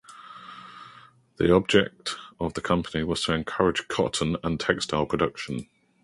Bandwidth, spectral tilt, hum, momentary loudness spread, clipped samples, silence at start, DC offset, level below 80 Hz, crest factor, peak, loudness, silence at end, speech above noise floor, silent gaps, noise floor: 11.5 kHz; -5 dB/octave; none; 21 LU; under 0.1%; 0.1 s; under 0.1%; -48 dBFS; 22 dB; -4 dBFS; -26 LUFS; 0.4 s; 27 dB; none; -52 dBFS